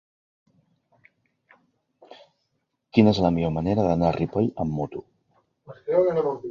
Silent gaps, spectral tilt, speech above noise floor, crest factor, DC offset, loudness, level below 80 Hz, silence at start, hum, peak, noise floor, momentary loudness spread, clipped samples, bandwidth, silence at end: none; -8.5 dB/octave; 54 dB; 22 dB; under 0.1%; -23 LUFS; -48 dBFS; 2.1 s; none; -4 dBFS; -76 dBFS; 11 LU; under 0.1%; 7.2 kHz; 0 s